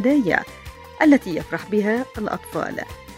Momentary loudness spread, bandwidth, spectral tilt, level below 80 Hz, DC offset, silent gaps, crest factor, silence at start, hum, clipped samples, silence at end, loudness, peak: 17 LU; 15.5 kHz; -6 dB/octave; -48 dBFS; under 0.1%; none; 20 dB; 0 s; none; under 0.1%; 0 s; -21 LUFS; -2 dBFS